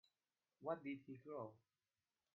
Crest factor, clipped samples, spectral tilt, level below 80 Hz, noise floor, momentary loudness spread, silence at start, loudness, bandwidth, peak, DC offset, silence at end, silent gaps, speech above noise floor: 24 dB; under 0.1%; -6 dB/octave; under -90 dBFS; under -90 dBFS; 6 LU; 0.6 s; -52 LUFS; 5.4 kHz; -32 dBFS; under 0.1%; 0.8 s; none; over 39 dB